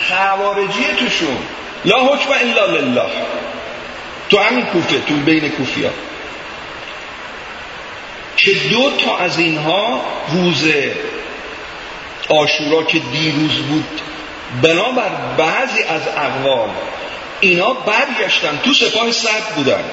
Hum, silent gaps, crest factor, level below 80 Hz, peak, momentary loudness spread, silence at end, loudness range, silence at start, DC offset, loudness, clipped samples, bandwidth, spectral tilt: none; none; 16 dB; -50 dBFS; 0 dBFS; 16 LU; 0 s; 3 LU; 0 s; under 0.1%; -14 LUFS; under 0.1%; 8 kHz; -4 dB/octave